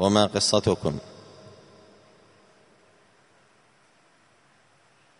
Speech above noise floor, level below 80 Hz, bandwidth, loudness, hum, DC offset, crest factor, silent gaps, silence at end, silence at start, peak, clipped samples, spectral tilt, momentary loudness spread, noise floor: 38 dB; -58 dBFS; 10.5 kHz; -23 LUFS; none; under 0.1%; 26 dB; none; 4 s; 0 s; -4 dBFS; under 0.1%; -4.5 dB/octave; 27 LU; -61 dBFS